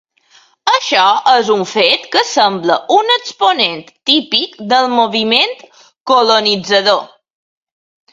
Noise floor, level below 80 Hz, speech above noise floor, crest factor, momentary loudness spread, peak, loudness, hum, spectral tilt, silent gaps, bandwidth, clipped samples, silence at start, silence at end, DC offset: -49 dBFS; -64 dBFS; 37 dB; 14 dB; 6 LU; 0 dBFS; -12 LUFS; none; -2.5 dB/octave; 6.00-6.05 s; 10.5 kHz; under 0.1%; 0.65 s; 1.05 s; under 0.1%